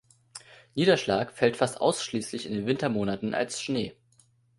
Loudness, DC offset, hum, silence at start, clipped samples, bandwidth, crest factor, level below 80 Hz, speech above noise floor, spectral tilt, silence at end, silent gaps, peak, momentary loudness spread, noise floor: -28 LUFS; under 0.1%; none; 0.35 s; under 0.1%; 11.5 kHz; 20 dB; -62 dBFS; 37 dB; -4.5 dB/octave; 0.65 s; none; -8 dBFS; 16 LU; -64 dBFS